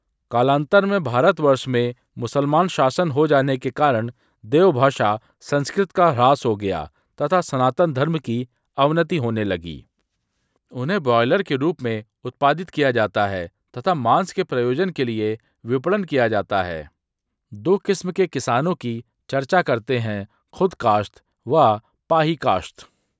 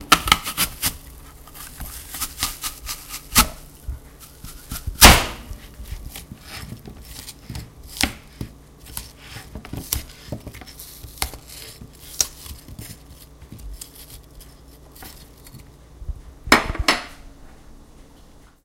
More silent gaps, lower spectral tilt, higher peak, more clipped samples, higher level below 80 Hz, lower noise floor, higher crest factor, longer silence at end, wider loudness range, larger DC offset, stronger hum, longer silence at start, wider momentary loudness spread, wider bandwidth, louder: neither; first, -6.5 dB/octave vs -2 dB/octave; about the same, -2 dBFS vs 0 dBFS; neither; second, -54 dBFS vs -32 dBFS; first, -80 dBFS vs -48 dBFS; second, 18 dB vs 26 dB; second, 0.35 s vs 0.6 s; second, 4 LU vs 14 LU; neither; neither; first, 0.3 s vs 0 s; second, 12 LU vs 23 LU; second, 8 kHz vs 17 kHz; about the same, -20 LUFS vs -19 LUFS